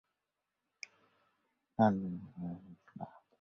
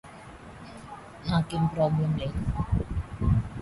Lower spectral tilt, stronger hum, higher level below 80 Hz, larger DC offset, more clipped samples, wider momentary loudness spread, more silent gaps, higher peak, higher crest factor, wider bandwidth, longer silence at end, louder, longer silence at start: about the same, -7.5 dB/octave vs -8 dB/octave; neither; second, -70 dBFS vs -38 dBFS; neither; neither; about the same, 21 LU vs 19 LU; neither; second, -16 dBFS vs -12 dBFS; first, 24 dB vs 16 dB; second, 6.6 kHz vs 11.5 kHz; first, 0.3 s vs 0 s; second, -35 LUFS vs -28 LUFS; first, 1.8 s vs 0.05 s